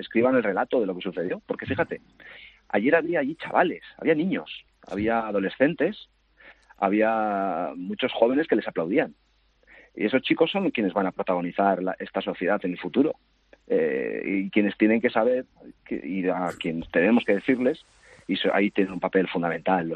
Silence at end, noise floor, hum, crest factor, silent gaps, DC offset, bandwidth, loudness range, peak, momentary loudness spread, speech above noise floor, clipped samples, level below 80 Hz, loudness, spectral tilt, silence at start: 0 s; -61 dBFS; none; 20 dB; none; under 0.1%; 8.8 kHz; 2 LU; -6 dBFS; 9 LU; 36 dB; under 0.1%; -62 dBFS; -25 LUFS; -7.5 dB/octave; 0 s